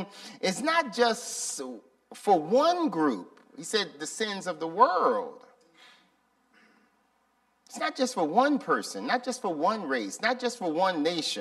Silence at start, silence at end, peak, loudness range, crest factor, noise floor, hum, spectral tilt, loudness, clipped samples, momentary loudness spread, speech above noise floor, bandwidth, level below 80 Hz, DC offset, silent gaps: 0 s; 0 s; -6 dBFS; 4 LU; 22 dB; -70 dBFS; none; -3 dB/octave; -28 LUFS; under 0.1%; 11 LU; 42 dB; 14 kHz; -82 dBFS; under 0.1%; none